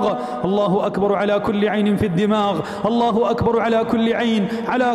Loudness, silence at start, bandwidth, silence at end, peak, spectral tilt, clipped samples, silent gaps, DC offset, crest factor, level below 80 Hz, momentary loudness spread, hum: -19 LUFS; 0 s; 12 kHz; 0 s; -6 dBFS; -7 dB/octave; under 0.1%; none; under 0.1%; 12 dB; -48 dBFS; 3 LU; none